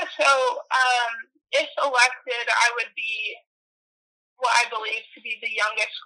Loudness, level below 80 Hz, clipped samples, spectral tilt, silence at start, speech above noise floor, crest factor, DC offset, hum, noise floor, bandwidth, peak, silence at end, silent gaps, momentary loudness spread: -22 LUFS; under -90 dBFS; under 0.1%; 3 dB/octave; 0 s; over 67 dB; 20 dB; under 0.1%; none; under -90 dBFS; 12.5 kHz; -4 dBFS; 0.05 s; 3.46-4.36 s; 10 LU